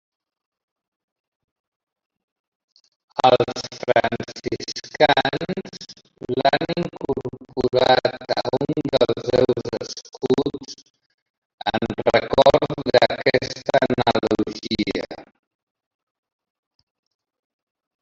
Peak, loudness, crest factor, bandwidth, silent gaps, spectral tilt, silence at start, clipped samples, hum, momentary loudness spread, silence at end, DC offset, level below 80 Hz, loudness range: -2 dBFS; -21 LUFS; 22 dB; 7.8 kHz; 10.90-10.94 s, 11.06-11.58 s; -5 dB/octave; 3.15 s; under 0.1%; none; 14 LU; 2.8 s; under 0.1%; -52 dBFS; 6 LU